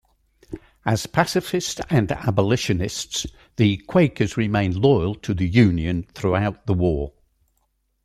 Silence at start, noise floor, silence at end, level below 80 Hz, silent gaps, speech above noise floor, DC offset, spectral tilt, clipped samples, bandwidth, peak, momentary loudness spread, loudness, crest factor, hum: 0.5 s; -69 dBFS; 0.95 s; -42 dBFS; none; 49 dB; under 0.1%; -6 dB/octave; under 0.1%; 15 kHz; -2 dBFS; 10 LU; -21 LUFS; 18 dB; none